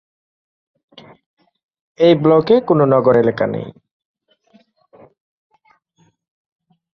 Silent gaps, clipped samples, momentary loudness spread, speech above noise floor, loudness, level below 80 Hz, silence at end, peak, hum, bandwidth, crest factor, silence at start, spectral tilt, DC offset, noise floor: none; under 0.1%; 10 LU; 46 dB; -14 LUFS; -58 dBFS; 3.25 s; -2 dBFS; none; 6 kHz; 18 dB; 2 s; -9 dB/octave; under 0.1%; -60 dBFS